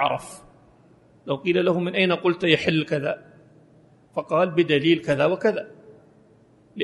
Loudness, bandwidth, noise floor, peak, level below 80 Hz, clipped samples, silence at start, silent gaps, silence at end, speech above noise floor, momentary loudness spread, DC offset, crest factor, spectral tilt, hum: -22 LUFS; 11.5 kHz; -55 dBFS; -4 dBFS; -62 dBFS; under 0.1%; 0 s; none; 0 s; 34 dB; 14 LU; under 0.1%; 20 dB; -6 dB/octave; none